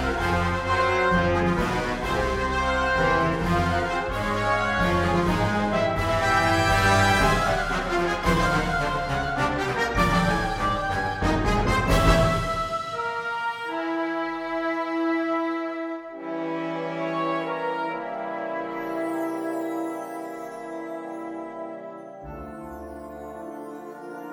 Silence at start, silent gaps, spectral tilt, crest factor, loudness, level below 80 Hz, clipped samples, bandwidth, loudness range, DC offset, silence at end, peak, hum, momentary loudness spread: 0 s; none; -5.5 dB/octave; 18 dB; -24 LUFS; -36 dBFS; under 0.1%; 16.5 kHz; 11 LU; under 0.1%; 0 s; -6 dBFS; none; 16 LU